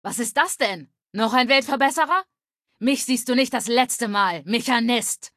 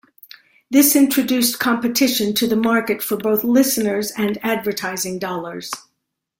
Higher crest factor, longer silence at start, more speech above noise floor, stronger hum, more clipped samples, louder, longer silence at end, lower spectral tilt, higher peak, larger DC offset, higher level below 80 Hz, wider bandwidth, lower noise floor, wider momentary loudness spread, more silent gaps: about the same, 18 dB vs 16 dB; second, 0.05 s vs 0.7 s; second, 52 dB vs 57 dB; neither; neither; second, -21 LUFS vs -18 LUFS; second, 0.1 s vs 0.6 s; about the same, -2 dB/octave vs -3 dB/octave; about the same, -4 dBFS vs -2 dBFS; neither; second, -72 dBFS vs -60 dBFS; second, 15 kHz vs 17 kHz; about the same, -74 dBFS vs -75 dBFS; second, 7 LU vs 11 LU; neither